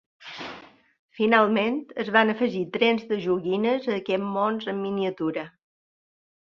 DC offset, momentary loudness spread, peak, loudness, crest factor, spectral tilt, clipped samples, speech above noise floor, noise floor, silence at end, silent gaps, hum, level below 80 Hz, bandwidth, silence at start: under 0.1%; 17 LU; -4 dBFS; -24 LUFS; 22 dB; -7 dB/octave; under 0.1%; 22 dB; -46 dBFS; 1.1 s; 0.99-1.09 s; none; -70 dBFS; 6.6 kHz; 0.2 s